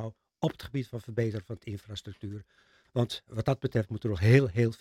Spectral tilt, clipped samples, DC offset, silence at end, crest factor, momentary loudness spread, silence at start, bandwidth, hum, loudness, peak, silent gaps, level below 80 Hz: -7.5 dB/octave; under 0.1%; under 0.1%; 0.05 s; 22 dB; 19 LU; 0 s; 13 kHz; none; -30 LUFS; -8 dBFS; none; -58 dBFS